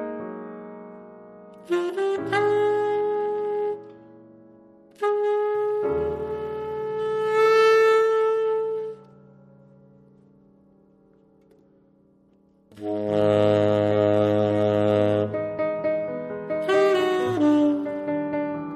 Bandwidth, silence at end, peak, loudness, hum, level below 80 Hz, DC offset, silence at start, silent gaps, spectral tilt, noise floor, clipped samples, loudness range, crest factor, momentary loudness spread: 12.5 kHz; 0 s; -8 dBFS; -23 LUFS; none; -60 dBFS; under 0.1%; 0 s; none; -7 dB/octave; -59 dBFS; under 0.1%; 6 LU; 16 dB; 13 LU